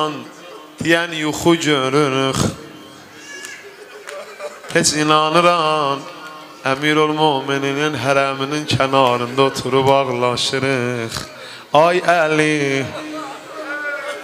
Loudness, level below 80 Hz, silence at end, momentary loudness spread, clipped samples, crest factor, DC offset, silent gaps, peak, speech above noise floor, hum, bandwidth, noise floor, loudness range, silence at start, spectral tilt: -17 LUFS; -54 dBFS; 0 s; 19 LU; under 0.1%; 18 dB; under 0.1%; none; 0 dBFS; 22 dB; none; 16 kHz; -38 dBFS; 3 LU; 0 s; -4 dB/octave